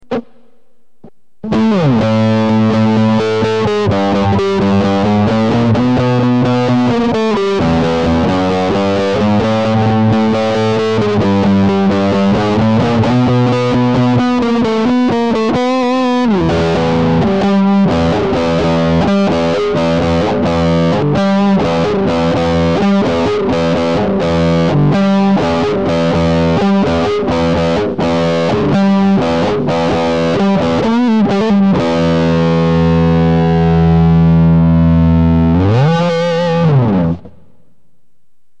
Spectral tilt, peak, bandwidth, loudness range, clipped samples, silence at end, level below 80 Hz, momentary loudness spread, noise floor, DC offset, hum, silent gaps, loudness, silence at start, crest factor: -7.5 dB/octave; -2 dBFS; 8.6 kHz; 3 LU; under 0.1%; 1.3 s; -32 dBFS; 3 LU; -65 dBFS; 2%; none; none; -12 LUFS; 0.1 s; 8 dB